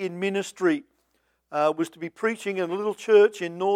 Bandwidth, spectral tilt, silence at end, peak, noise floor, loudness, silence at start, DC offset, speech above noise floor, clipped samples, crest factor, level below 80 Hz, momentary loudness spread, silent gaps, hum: 12.5 kHz; -5 dB/octave; 0 s; -6 dBFS; -71 dBFS; -25 LUFS; 0 s; under 0.1%; 47 dB; under 0.1%; 18 dB; -78 dBFS; 12 LU; none; none